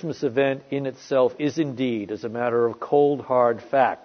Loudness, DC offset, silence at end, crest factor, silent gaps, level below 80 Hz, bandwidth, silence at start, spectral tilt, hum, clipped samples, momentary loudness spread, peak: -23 LUFS; under 0.1%; 0.1 s; 16 dB; none; -70 dBFS; 6.6 kHz; 0 s; -7 dB/octave; none; under 0.1%; 8 LU; -6 dBFS